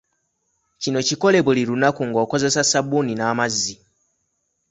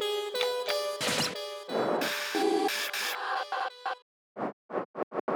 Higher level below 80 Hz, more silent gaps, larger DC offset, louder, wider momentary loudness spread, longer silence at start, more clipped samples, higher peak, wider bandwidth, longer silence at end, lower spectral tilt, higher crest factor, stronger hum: first, -60 dBFS vs -80 dBFS; second, none vs 4.02-4.35 s, 4.53-4.69 s, 4.85-4.94 s, 5.03-5.11 s, 5.20-5.28 s; neither; first, -19 LUFS vs -31 LUFS; second, 6 LU vs 10 LU; first, 0.8 s vs 0 s; neither; first, -2 dBFS vs -14 dBFS; second, 8.4 kHz vs over 20 kHz; first, 0.95 s vs 0 s; about the same, -3.5 dB/octave vs -2.5 dB/octave; about the same, 18 dB vs 18 dB; neither